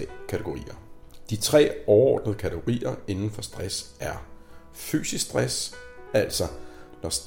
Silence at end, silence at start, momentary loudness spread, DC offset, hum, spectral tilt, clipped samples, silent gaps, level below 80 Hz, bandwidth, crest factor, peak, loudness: 0 s; 0 s; 18 LU; under 0.1%; none; -4.5 dB/octave; under 0.1%; none; -48 dBFS; 16.5 kHz; 20 dB; -6 dBFS; -26 LUFS